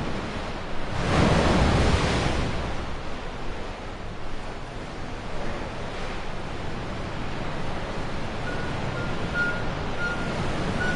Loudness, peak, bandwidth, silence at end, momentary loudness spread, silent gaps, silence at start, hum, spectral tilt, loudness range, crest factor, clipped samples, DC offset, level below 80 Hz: -28 LUFS; -8 dBFS; 11 kHz; 0 s; 14 LU; none; 0 s; none; -5.5 dB/octave; 10 LU; 18 dB; under 0.1%; under 0.1%; -34 dBFS